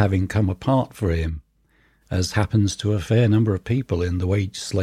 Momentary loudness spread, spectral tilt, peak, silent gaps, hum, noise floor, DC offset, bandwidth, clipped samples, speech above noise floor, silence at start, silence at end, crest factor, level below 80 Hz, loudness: 7 LU; -6.5 dB/octave; -6 dBFS; none; none; -61 dBFS; under 0.1%; 13 kHz; under 0.1%; 40 dB; 0 s; 0 s; 16 dB; -38 dBFS; -22 LUFS